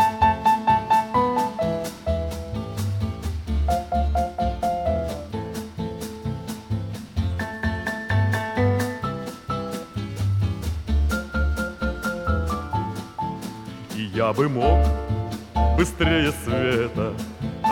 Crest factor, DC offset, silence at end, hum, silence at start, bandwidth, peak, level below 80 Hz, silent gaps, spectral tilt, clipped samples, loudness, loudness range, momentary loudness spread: 18 dB; under 0.1%; 0 s; none; 0 s; 18 kHz; -6 dBFS; -32 dBFS; none; -6.5 dB/octave; under 0.1%; -24 LUFS; 5 LU; 11 LU